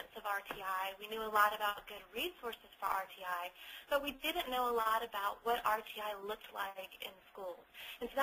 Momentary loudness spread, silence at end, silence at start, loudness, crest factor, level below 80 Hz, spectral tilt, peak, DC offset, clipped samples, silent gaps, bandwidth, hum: 15 LU; 0 s; 0 s; -39 LUFS; 24 dB; -68 dBFS; -2 dB/octave; -16 dBFS; under 0.1%; under 0.1%; none; 15.5 kHz; none